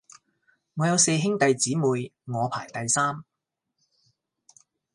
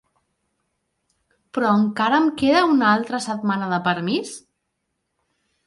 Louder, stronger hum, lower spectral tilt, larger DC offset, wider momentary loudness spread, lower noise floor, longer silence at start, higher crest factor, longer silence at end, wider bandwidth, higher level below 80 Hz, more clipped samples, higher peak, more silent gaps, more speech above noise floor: second, -24 LUFS vs -20 LUFS; neither; second, -4 dB/octave vs -5.5 dB/octave; neither; about the same, 11 LU vs 10 LU; first, -82 dBFS vs -76 dBFS; second, 0.75 s vs 1.55 s; about the same, 20 dB vs 18 dB; first, 1.7 s vs 1.25 s; about the same, 11.5 kHz vs 11.5 kHz; second, -70 dBFS vs -62 dBFS; neither; about the same, -6 dBFS vs -6 dBFS; neither; about the same, 57 dB vs 57 dB